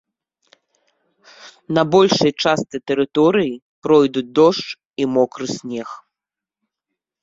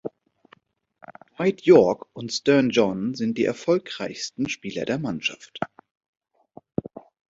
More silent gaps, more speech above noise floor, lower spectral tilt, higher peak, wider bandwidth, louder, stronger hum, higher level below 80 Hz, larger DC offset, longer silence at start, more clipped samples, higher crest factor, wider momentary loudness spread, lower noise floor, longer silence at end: first, 3.62-3.82 s, 4.85-4.90 s vs 5.91-5.95 s, 6.08-6.13 s; first, 70 dB vs 36 dB; about the same, -5.5 dB/octave vs -5.5 dB/octave; about the same, 0 dBFS vs -2 dBFS; about the same, 7.8 kHz vs 8 kHz; first, -17 LUFS vs -23 LUFS; neither; about the same, -60 dBFS vs -62 dBFS; neither; first, 1.45 s vs 0.05 s; neither; about the same, 18 dB vs 22 dB; second, 14 LU vs 17 LU; first, -87 dBFS vs -59 dBFS; first, 1.25 s vs 0.3 s